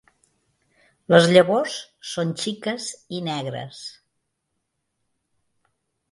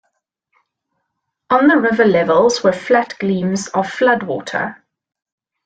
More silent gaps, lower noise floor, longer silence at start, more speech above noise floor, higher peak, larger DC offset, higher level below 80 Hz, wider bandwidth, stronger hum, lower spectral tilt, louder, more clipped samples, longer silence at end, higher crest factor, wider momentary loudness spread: neither; about the same, -77 dBFS vs -75 dBFS; second, 1.1 s vs 1.5 s; second, 56 dB vs 60 dB; about the same, 0 dBFS vs -2 dBFS; neither; second, -68 dBFS vs -58 dBFS; first, 11.5 kHz vs 9.2 kHz; neither; about the same, -5 dB/octave vs -5 dB/octave; second, -21 LUFS vs -15 LUFS; neither; first, 2.2 s vs 0.9 s; first, 24 dB vs 16 dB; first, 18 LU vs 9 LU